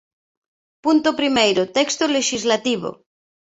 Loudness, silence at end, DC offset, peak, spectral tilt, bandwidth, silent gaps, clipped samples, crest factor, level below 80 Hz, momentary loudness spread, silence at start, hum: -19 LUFS; 0.5 s; under 0.1%; -2 dBFS; -2.5 dB/octave; 8.2 kHz; none; under 0.1%; 18 dB; -62 dBFS; 8 LU; 0.85 s; none